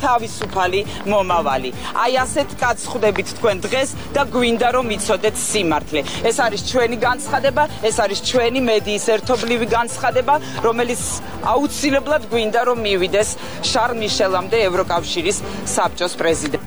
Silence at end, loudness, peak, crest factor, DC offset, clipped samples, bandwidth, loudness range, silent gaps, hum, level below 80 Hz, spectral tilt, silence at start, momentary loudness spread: 0 s; -18 LUFS; -6 dBFS; 14 dB; 2%; under 0.1%; over 20 kHz; 1 LU; none; none; -42 dBFS; -3.5 dB/octave; 0 s; 4 LU